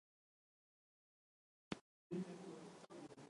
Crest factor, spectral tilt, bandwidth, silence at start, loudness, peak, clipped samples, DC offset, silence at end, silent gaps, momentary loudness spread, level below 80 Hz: 30 dB; -6 dB/octave; 11 kHz; 1.7 s; -53 LUFS; -26 dBFS; under 0.1%; under 0.1%; 0 s; 1.81-2.10 s; 9 LU; -84 dBFS